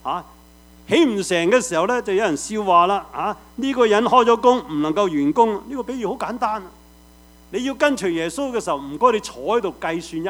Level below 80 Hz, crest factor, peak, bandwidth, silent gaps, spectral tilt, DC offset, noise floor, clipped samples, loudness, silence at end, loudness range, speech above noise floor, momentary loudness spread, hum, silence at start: -52 dBFS; 20 dB; 0 dBFS; over 20 kHz; none; -4 dB/octave; under 0.1%; -48 dBFS; under 0.1%; -20 LUFS; 0 s; 5 LU; 29 dB; 11 LU; none; 0.05 s